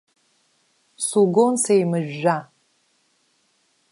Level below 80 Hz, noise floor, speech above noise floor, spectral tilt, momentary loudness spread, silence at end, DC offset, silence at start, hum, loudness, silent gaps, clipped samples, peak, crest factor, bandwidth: -76 dBFS; -65 dBFS; 46 dB; -5 dB/octave; 8 LU; 1.5 s; under 0.1%; 1 s; none; -20 LUFS; none; under 0.1%; -4 dBFS; 18 dB; 11.5 kHz